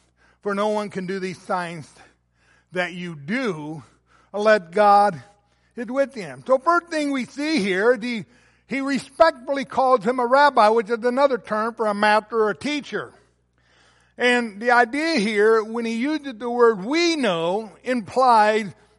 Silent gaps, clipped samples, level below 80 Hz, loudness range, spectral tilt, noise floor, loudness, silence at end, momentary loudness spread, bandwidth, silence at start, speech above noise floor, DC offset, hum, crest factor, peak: none; under 0.1%; -66 dBFS; 7 LU; -4.5 dB/octave; -62 dBFS; -21 LUFS; 0.25 s; 13 LU; 11.5 kHz; 0.45 s; 42 dB; under 0.1%; 60 Hz at -60 dBFS; 18 dB; -4 dBFS